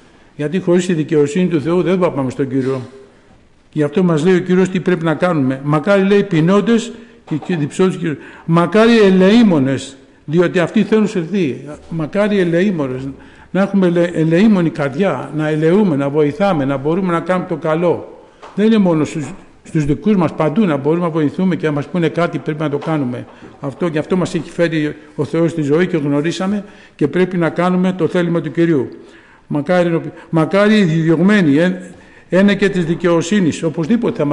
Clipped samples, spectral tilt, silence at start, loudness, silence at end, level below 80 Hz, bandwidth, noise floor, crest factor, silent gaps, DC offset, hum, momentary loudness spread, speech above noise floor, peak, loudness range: under 0.1%; -7 dB/octave; 0.4 s; -15 LUFS; 0 s; -48 dBFS; 10.5 kHz; -47 dBFS; 12 dB; none; under 0.1%; none; 10 LU; 33 dB; -4 dBFS; 4 LU